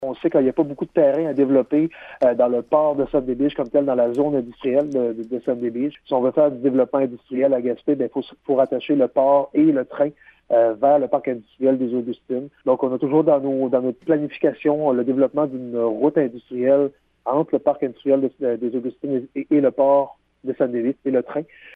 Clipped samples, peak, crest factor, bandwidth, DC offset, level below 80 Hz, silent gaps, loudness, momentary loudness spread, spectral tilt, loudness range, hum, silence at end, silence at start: under 0.1%; -4 dBFS; 16 dB; 4.7 kHz; under 0.1%; -60 dBFS; none; -20 LUFS; 8 LU; -9.5 dB/octave; 2 LU; none; 0.05 s; 0 s